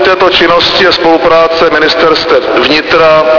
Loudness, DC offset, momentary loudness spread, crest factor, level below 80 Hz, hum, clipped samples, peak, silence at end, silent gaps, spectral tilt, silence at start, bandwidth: -6 LUFS; 0.6%; 2 LU; 6 dB; -36 dBFS; none; 3%; 0 dBFS; 0 s; none; -4 dB/octave; 0 s; 5.4 kHz